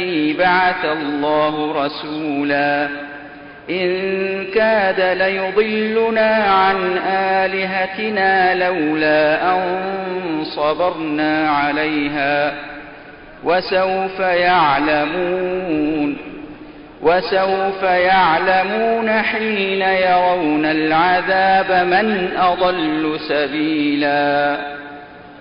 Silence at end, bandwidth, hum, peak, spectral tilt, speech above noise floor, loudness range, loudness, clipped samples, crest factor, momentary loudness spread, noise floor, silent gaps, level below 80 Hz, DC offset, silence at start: 0 s; 5.4 kHz; none; -4 dBFS; -10 dB/octave; 21 dB; 4 LU; -17 LUFS; under 0.1%; 12 dB; 9 LU; -38 dBFS; none; -50 dBFS; under 0.1%; 0 s